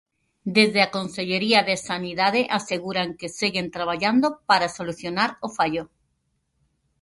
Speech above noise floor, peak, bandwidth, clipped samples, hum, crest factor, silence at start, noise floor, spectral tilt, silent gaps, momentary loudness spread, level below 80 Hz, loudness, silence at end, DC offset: 49 dB; -4 dBFS; 11.5 kHz; under 0.1%; none; 20 dB; 0.45 s; -72 dBFS; -4 dB/octave; none; 9 LU; -62 dBFS; -23 LUFS; 1.15 s; under 0.1%